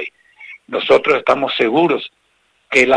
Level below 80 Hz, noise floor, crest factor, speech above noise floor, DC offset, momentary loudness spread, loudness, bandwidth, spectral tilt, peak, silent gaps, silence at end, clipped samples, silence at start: -56 dBFS; -61 dBFS; 16 dB; 46 dB; under 0.1%; 19 LU; -15 LUFS; 10.5 kHz; -4 dB/octave; -2 dBFS; none; 0 s; under 0.1%; 0 s